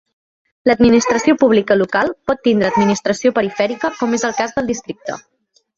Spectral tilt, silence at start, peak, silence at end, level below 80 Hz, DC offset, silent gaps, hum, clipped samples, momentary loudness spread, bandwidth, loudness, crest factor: -5 dB/octave; 0.65 s; -2 dBFS; 0.6 s; -48 dBFS; under 0.1%; none; none; under 0.1%; 11 LU; 7.8 kHz; -16 LUFS; 14 dB